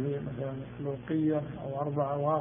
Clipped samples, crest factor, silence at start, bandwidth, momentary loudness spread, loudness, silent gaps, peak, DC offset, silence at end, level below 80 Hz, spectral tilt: under 0.1%; 16 dB; 0 s; 3.7 kHz; 8 LU; -33 LUFS; none; -16 dBFS; under 0.1%; 0 s; -60 dBFS; -7 dB/octave